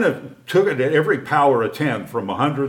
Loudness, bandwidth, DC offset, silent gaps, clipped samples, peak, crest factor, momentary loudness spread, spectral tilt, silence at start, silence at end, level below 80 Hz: -19 LUFS; 17.5 kHz; under 0.1%; none; under 0.1%; -2 dBFS; 16 dB; 8 LU; -6.5 dB/octave; 0 s; 0 s; -66 dBFS